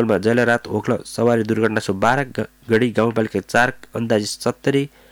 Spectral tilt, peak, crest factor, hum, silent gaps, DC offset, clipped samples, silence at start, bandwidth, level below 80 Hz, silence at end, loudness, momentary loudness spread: -5.5 dB/octave; -4 dBFS; 14 dB; none; none; under 0.1%; under 0.1%; 0 s; 17.5 kHz; -54 dBFS; 0.25 s; -19 LUFS; 6 LU